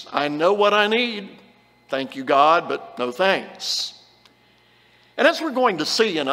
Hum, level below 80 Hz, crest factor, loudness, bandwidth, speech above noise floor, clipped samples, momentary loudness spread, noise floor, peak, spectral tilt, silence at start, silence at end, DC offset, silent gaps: 60 Hz at -60 dBFS; -74 dBFS; 20 dB; -20 LUFS; 16 kHz; 36 dB; under 0.1%; 13 LU; -57 dBFS; -2 dBFS; -3 dB/octave; 0 s; 0 s; under 0.1%; none